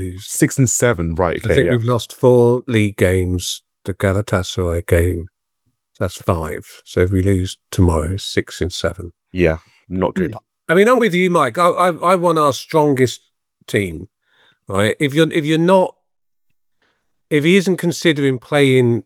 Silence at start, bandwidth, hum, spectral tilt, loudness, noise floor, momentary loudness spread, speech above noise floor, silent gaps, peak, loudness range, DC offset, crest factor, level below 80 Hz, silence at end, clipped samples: 0 s; 17 kHz; none; -5.5 dB/octave; -16 LUFS; -73 dBFS; 11 LU; 57 dB; none; 0 dBFS; 5 LU; under 0.1%; 16 dB; -42 dBFS; 0.05 s; under 0.1%